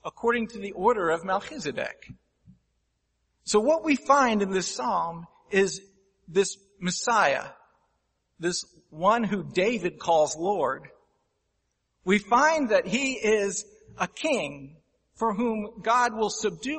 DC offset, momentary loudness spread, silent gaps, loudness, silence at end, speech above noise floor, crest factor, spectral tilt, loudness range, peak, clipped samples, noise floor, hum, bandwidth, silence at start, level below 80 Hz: under 0.1%; 12 LU; none; -26 LUFS; 0 s; 51 dB; 20 dB; -4 dB/octave; 3 LU; -6 dBFS; under 0.1%; -76 dBFS; none; 8.8 kHz; 0.05 s; -62 dBFS